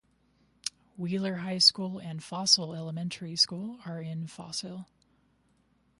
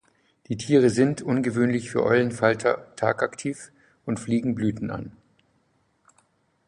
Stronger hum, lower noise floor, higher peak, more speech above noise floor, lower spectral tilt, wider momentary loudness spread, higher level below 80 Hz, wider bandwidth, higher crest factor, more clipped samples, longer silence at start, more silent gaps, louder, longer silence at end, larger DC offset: neither; about the same, -69 dBFS vs -68 dBFS; about the same, -6 dBFS vs -4 dBFS; second, 38 dB vs 44 dB; second, -3 dB/octave vs -6.5 dB/octave; first, 17 LU vs 13 LU; second, -74 dBFS vs -58 dBFS; about the same, 11.5 kHz vs 11 kHz; about the same, 26 dB vs 22 dB; neither; first, 0.65 s vs 0.5 s; neither; second, -29 LUFS vs -24 LUFS; second, 1.15 s vs 1.55 s; neither